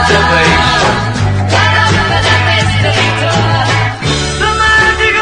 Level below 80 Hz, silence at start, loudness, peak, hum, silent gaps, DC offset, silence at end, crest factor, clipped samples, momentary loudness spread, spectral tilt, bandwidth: -26 dBFS; 0 s; -9 LUFS; 0 dBFS; none; none; under 0.1%; 0 s; 10 dB; 0.2%; 6 LU; -4 dB/octave; 10.5 kHz